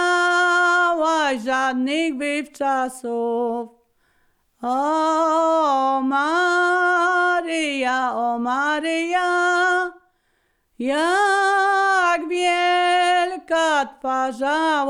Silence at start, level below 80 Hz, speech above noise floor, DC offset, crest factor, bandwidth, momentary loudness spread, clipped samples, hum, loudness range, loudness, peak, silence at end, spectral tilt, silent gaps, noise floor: 0 s; -64 dBFS; 47 dB; under 0.1%; 10 dB; 13.5 kHz; 7 LU; under 0.1%; none; 5 LU; -19 LUFS; -10 dBFS; 0 s; -2 dB/octave; none; -67 dBFS